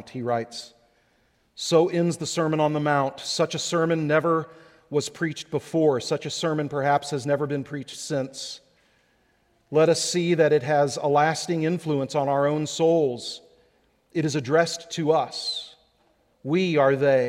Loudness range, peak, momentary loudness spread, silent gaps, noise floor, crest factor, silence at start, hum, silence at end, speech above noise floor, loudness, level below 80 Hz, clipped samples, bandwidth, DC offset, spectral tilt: 5 LU; -6 dBFS; 12 LU; none; -66 dBFS; 18 dB; 0.05 s; none; 0 s; 42 dB; -24 LUFS; -68 dBFS; under 0.1%; 15 kHz; under 0.1%; -5 dB/octave